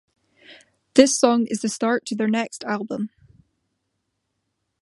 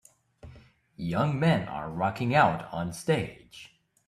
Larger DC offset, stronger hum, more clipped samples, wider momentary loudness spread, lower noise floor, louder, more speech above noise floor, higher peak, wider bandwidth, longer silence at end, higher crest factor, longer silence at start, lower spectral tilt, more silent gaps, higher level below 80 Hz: neither; neither; neither; second, 13 LU vs 17 LU; first, -76 dBFS vs -54 dBFS; first, -21 LUFS vs -28 LUFS; first, 56 dB vs 27 dB; first, 0 dBFS vs -8 dBFS; second, 11.5 kHz vs 13.5 kHz; first, 1.75 s vs 0.4 s; about the same, 24 dB vs 22 dB; about the same, 0.5 s vs 0.45 s; second, -3.5 dB/octave vs -6.5 dB/octave; neither; second, -66 dBFS vs -58 dBFS